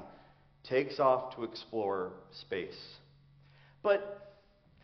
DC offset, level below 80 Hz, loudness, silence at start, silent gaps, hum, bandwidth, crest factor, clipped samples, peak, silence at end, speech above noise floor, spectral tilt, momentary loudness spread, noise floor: under 0.1%; -72 dBFS; -34 LUFS; 0 s; none; none; 6.2 kHz; 22 dB; under 0.1%; -14 dBFS; 0.55 s; 30 dB; -3.5 dB/octave; 21 LU; -64 dBFS